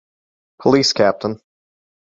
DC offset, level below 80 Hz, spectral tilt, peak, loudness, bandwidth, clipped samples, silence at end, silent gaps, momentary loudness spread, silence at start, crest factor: under 0.1%; -56 dBFS; -4 dB/octave; -2 dBFS; -17 LUFS; 7.8 kHz; under 0.1%; 0.8 s; none; 13 LU; 0.6 s; 18 dB